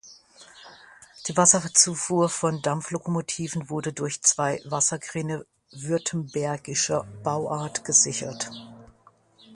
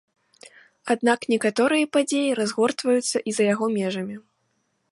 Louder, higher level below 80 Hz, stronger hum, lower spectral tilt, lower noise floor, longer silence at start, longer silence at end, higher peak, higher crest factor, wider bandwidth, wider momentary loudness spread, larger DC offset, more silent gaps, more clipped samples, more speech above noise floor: about the same, -24 LUFS vs -23 LUFS; first, -64 dBFS vs -74 dBFS; neither; about the same, -3 dB/octave vs -4 dB/octave; second, -58 dBFS vs -71 dBFS; second, 0.05 s vs 0.85 s; second, 0 s vs 0.75 s; first, -2 dBFS vs -6 dBFS; first, 24 dB vs 18 dB; about the same, 11.5 kHz vs 11.5 kHz; first, 13 LU vs 9 LU; neither; neither; neither; second, 33 dB vs 49 dB